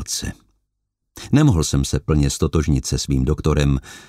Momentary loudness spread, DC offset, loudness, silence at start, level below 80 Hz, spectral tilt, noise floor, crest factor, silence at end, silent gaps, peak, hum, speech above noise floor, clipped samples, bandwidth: 9 LU; under 0.1%; -19 LUFS; 0 s; -28 dBFS; -5.5 dB/octave; -76 dBFS; 18 dB; 0.05 s; none; -2 dBFS; none; 57 dB; under 0.1%; 15 kHz